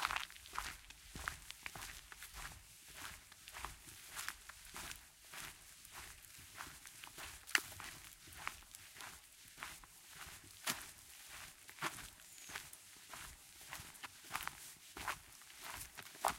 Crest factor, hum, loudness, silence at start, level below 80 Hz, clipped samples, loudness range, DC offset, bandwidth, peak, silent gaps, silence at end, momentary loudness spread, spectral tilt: 38 dB; none; -48 LUFS; 0 s; -66 dBFS; under 0.1%; 5 LU; under 0.1%; 17 kHz; -12 dBFS; none; 0 s; 12 LU; -1 dB/octave